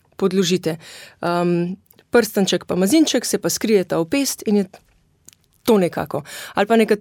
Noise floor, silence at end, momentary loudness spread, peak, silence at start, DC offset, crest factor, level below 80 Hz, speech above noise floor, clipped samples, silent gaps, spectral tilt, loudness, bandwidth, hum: -52 dBFS; 0 s; 11 LU; -4 dBFS; 0.2 s; under 0.1%; 16 dB; -58 dBFS; 34 dB; under 0.1%; none; -4.5 dB/octave; -19 LUFS; 17.5 kHz; none